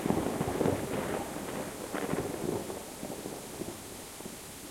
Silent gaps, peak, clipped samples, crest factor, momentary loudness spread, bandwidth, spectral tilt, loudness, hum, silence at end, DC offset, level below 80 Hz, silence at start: none; -14 dBFS; under 0.1%; 22 dB; 11 LU; 16.5 kHz; -5 dB/octave; -36 LUFS; none; 0 s; under 0.1%; -56 dBFS; 0 s